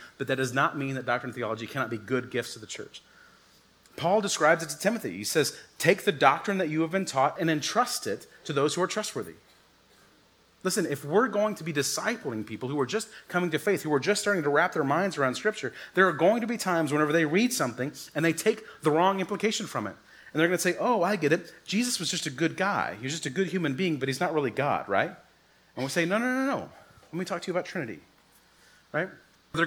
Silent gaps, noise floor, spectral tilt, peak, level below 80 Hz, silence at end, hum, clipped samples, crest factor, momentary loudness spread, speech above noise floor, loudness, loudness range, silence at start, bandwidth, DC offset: none; -61 dBFS; -4 dB/octave; -4 dBFS; -72 dBFS; 0 s; none; under 0.1%; 24 dB; 11 LU; 34 dB; -28 LUFS; 6 LU; 0 s; 20 kHz; under 0.1%